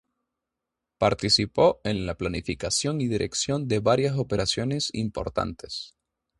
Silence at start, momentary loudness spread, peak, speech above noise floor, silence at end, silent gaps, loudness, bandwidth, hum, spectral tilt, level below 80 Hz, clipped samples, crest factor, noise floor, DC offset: 1 s; 9 LU; -6 dBFS; 60 dB; 0.55 s; none; -25 LUFS; 11.5 kHz; none; -4.5 dB/octave; -48 dBFS; under 0.1%; 20 dB; -86 dBFS; under 0.1%